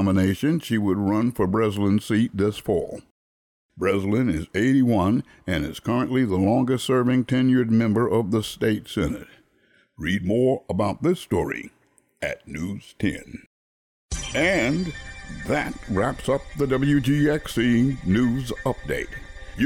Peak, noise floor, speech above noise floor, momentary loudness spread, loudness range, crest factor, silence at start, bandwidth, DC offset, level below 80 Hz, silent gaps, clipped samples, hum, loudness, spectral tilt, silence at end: -10 dBFS; -62 dBFS; 39 dB; 12 LU; 5 LU; 12 dB; 0 s; 17 kHz; under 0.1%; -44 dBFS; 3.11-3.69 s, 13.46-14.09 s; under 0.1%; none; -23 LUFS; -6.5 dB/octave; 0 s